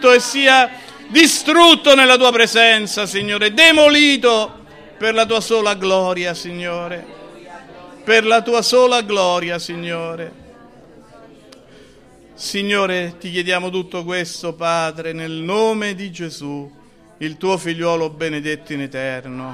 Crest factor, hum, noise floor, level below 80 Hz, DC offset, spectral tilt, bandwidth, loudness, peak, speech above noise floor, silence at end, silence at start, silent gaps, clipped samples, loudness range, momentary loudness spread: 16 dB; none; -45 dBFS; -56 dBFS; under 0.1%; -2.5 dB/octave; 15.5 kHz; -14 LUFS; 0 dBFS; 30 dB; 0 s; 0 s; none; under 0.1%; 13 LU; 19 LU